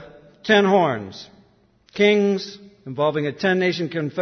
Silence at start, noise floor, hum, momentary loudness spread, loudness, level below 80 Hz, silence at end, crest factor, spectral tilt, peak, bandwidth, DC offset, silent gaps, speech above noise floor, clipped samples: 0 s; -58 dBFS; none; 20 LU; -20 LUFS; -64 dBFS; 0 s; 18 dB; -6 dB/octave; -4 dBFS; 6.6 kHz; under 0.1%; none; 38 dB; under 0.1%